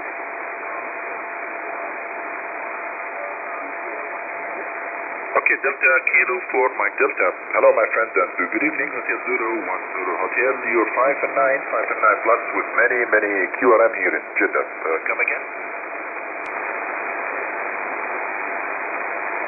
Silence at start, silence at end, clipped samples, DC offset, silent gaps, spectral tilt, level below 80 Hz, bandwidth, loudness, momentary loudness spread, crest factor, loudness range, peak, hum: 0 s; 0 s; under 0.1%; under 0.1%; none; -8.5 dB/octave; -74 dBFS; 3 kHz; -21 LUFS; 12 LU; 20 dB; 10 LU; -2 dBFS; none